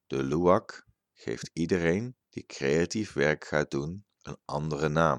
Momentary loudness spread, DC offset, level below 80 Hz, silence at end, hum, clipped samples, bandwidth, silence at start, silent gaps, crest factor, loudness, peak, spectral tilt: 18 LU; under 0.1%; -54 dBFS; 0 s; none; under 0.1%; 10.5 kHz; 0.1 s; none; 20 dB; -29 LUFS; -8 dBFS; -6 dB/octave